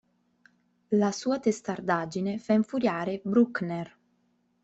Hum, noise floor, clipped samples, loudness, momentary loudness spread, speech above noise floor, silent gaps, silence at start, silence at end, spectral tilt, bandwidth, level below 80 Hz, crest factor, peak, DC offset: none; -71 dBFS; under 0.1%; -28 LUFS; 8 LU; 44 dB; none; 0.9 s; 0.75 s; -6 dB/octave; 8.2 kHz; -70 dBFS; 18 dB; -12 dBFS; under 0.1%